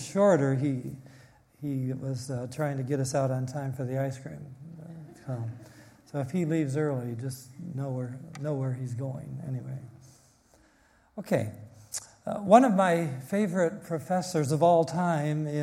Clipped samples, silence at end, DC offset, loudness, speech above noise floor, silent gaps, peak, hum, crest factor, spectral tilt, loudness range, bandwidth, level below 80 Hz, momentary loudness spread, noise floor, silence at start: under 0.1%; 0 s; under 0.1%; -29 LUFS; 35 dB; none; -6 dBFS; none; 24 dB; -7 dB/octave; 11 LU; 15.5 kHz; -68 dBFS; 19 LU; -63 dBFS; 0 s